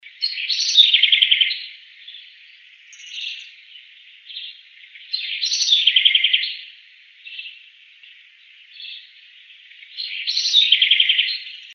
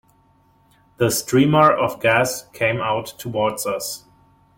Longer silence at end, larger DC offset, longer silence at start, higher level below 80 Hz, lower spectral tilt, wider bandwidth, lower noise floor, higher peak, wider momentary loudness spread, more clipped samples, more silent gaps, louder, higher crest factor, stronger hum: second, 0 s vs 0.6 s; neither; second, 0.05 s vs 1 s; second, under -90 dBFS vs -54 dBFS; second, 16.5 dB/octave vs -4.5 dB/octave; second, 7.4 kHz vs 17 kHz; second, -48 dBFS vs -57 dBFS; about the same, 0 dBFS vs -2 dBFS; first, 23 LU vs 12 LU; neither; neither; first, -15 LUFS vs -19 LUFS; about the same, 22 dB vs 18 dB; neither